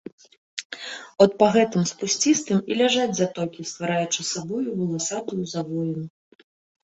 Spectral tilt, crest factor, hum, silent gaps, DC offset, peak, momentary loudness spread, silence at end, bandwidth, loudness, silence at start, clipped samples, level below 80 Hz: -4 dB/octave; 22 dB; none; 0.65-0.70 s; under 0.1%; -2 dBFS; 15 LU; 0.75 s; 8.4 kHz; -23 LUFS; 0.55 s; under 0.1%; -66 dBFS